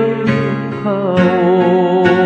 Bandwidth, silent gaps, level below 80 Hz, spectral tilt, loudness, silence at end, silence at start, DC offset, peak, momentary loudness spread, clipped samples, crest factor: 7.4 kHz; none; -52 dBFS; -8.5 dB/octave; -14 LUFS; 0 s; 0 s; under 0.1%; 0 dBFS; 7 LU; under 0.1%; 12 dB